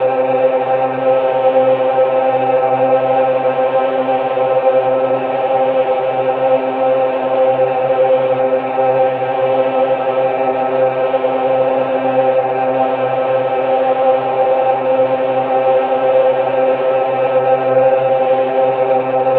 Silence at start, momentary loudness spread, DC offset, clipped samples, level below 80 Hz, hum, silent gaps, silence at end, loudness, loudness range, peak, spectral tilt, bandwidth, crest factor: 0 s; 3 LU; under 0.1%; under 0.1%; -62 dBFS; none; none; 0 s; -14 LUFS; 1 LU; -2 dBFS; -9 dB/octave; 4.2 kHz; 12 dB